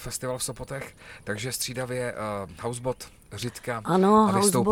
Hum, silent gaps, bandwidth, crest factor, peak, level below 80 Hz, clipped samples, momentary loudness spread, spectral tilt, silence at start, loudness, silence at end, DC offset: none; none; 17 kHz; 20 dB; -6 dBFS; -52 dBFS; under 0.1%; 18 LU; -4.5 dB/octave; 0 s; -26 LUFS; 0 s; under 0.1%